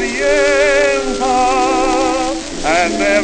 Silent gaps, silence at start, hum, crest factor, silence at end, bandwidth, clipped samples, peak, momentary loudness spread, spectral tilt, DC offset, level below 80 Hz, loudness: none; 0 s; none; 12 dB; 0 s; 9.8 kHz; under 0.1%; -2 dBFS; 5 LU; -2.5 dB/octave; under 0.1%; -32 dBFS; -14 LUFS